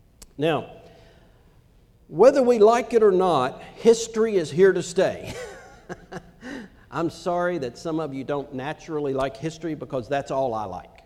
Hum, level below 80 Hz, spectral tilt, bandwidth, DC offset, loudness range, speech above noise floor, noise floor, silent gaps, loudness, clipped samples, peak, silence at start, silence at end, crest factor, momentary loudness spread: none; -54 dBFS; -5.5 dB/octave; 12.5 kHz; under 0.1%; 10 LU; 33 dB; -55 dBFS; none; -22 LUFS; under 0.1%; -4 dBFS; 0.2 s; 0.2 s; 20 dB; 21 LU